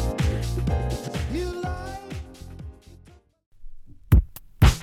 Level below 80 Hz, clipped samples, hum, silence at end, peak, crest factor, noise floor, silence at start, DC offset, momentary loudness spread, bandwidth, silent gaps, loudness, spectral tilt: -28 dBFS; under 0.1%; none; 0 s; -4 dBFS; 20 dB; -53 dBFS; 0 s; under 0.1%; 20 LU; 17 kHz; 3.46-3.52 s; -26 LUFS; -6 dB/octave